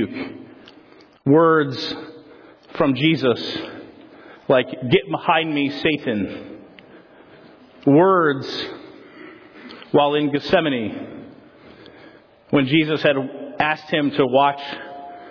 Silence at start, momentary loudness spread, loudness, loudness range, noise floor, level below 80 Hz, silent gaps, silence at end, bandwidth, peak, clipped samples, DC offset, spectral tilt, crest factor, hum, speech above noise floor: 0 s; 23 LU; -19 LUFS; 3 LU; -49 dBFS; -58 dBFS; none; 0 s; 5.4 kHz; -4 dBFS; under 0.1%; under 0.1%; -7.5 dB/octave; 18 dB; none; 30 dB